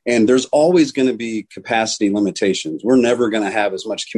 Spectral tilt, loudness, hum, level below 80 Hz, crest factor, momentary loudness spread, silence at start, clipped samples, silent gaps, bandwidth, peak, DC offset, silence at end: -4.5 dB/octave; -17 LUFS; none; -58 dBFS; 12 dB; 8 LU; 0.05 s; under 0.1%; none; 10.5 kHz; -4 dBFS; under 0.1%; 0 s